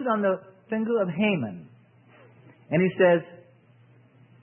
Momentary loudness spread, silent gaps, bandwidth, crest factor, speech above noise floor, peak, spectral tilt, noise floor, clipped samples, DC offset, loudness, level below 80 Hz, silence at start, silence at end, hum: 14 LU; none; 3.5 kHz; 20 dB; 32 dB; -8 dBFS; -11 dB/octave; -56 dBFS; under 0.1%; under 0.1%; -25 LUFS; -70 dBFS; 0 s; 1 s; none